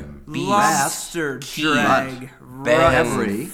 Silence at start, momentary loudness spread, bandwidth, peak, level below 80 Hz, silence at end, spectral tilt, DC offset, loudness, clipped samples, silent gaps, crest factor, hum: 0 s; 14 LU; 18 kHz; -2 dBFS; -42 dBFS; 0 s; -4 dB/octave; under 0.1%; -19 LUFS; under 0.1%; none; 18 dB; none